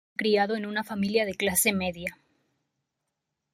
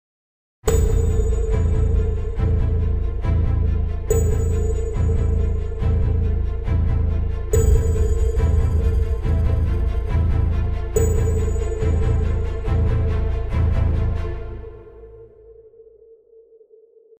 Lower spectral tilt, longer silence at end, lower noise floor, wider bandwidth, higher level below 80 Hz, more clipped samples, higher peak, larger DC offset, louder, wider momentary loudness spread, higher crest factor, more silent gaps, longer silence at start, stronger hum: second, -3.5 dB/octave vs -7.5 dB/octave; about the same, 1.4 s vs 1.4 s; first, -83 dBFS vs -51 dBFS; about the same, 16 kHz vs 16 kHz; second, -64 dBFS vs -22 dBFS; neither; second, -10 dBFS vs -4 dBFS; neither; second, -26 LUFS vs -21 LUFS; first, 9 LU vs 5 LU; about the same, 20 dB vs 16 dB; neither; second, 0.2 s vs 0.65 s; neither